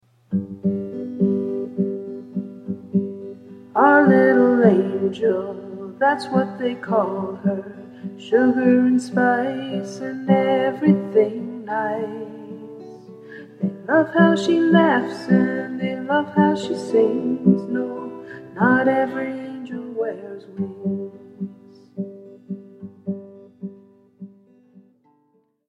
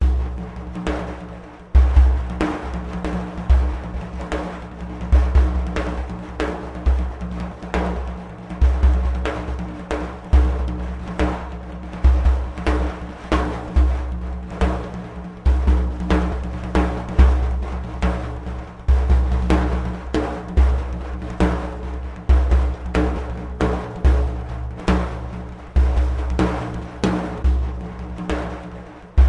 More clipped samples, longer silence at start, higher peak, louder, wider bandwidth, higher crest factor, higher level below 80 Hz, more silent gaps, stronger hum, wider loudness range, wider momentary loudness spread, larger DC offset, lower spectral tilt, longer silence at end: neither; first, 0.3 s vs 0 s; about the same, 0 dBFS vs -2 dBFS; about the same, -20 LUFS vs -22 LUFS; first, 9.6 kHz vs 8.2 kHz; about the same, 20 dB vs 18 dB; second, -66 dBFS vs -20 dBFS; neither; neither; first, 14 LU vs 2 LU; first, 20 LU vs 13 LU; neither; about the same, -7.5 dB/octave vs -7.5 dB/octave; first, 1.4 s vs 0 s